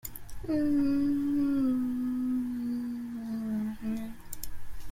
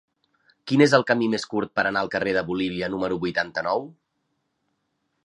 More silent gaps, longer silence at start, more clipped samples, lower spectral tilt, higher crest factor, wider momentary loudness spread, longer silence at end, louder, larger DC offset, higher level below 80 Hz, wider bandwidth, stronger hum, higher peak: neither; second, 0.05 s vs 0.65 s; neither; about the same, -6.5 dB/octave vs -5.5 dB/octave; second, 14 dB vs 22 dB; first, 15 LU vs 9 LU; second, 0 s vs 1.35 s; second, -31 LUFS vs -23 LUFS; neither; first, -50 dBFS vs -60 dBFS; first, 16.5 kHz vs 11 kHz; neither; second, -16 dBFS vs -2 dBFS